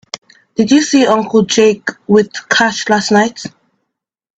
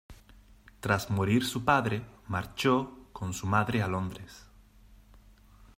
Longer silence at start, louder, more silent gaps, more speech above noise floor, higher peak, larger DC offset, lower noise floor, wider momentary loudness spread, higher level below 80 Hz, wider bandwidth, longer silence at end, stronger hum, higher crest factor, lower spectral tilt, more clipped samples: about the same, 0.15 s vs 0.1 s; first, -12 LUFS vs -30 LUFS; neither; first, 63 dB vs 28 dB; first, 0 dBFS vs -10 dBFS; neither; first, -74 dBFS vs -56 dBFS; first, 17 LU vs 13 LU; about the same, -54 dBFS vs -56 dBFS; second, 9 kHz vs 16 kHz; first, 0.9 s vs 0.15 s; neither; second, 14 dB vs 22 dB; second, -4 dB/octave vs -5.5 dB/octave; neither